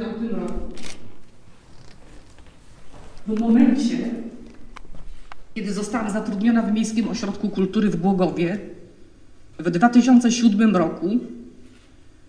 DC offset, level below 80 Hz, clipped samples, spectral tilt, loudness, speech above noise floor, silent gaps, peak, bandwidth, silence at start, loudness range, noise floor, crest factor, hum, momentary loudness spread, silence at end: under 0.1%; -44 dBFS; under 0.1%; -6 dB/octave; -20 LUFS; 28 dB; none; -4 dBFS; 10 kHz; 0 s; 6 LU; -47 dBFS; 18 dB; none; 20 LU; 0.2 s